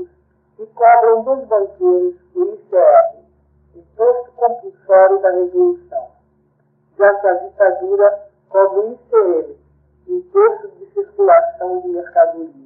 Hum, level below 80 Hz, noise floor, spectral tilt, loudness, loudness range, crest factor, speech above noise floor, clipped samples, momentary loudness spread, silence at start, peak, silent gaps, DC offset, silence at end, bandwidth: none; -62 dBFS; -59 dBFS; -11.5 dB/octave; -15 LUFS; 2 LU; 14 dB; 45 dB; under 0.1%; 15 LU; 0 s; 0 dBFS; none; under 0.1%; 0.15 s; 2.5 kHz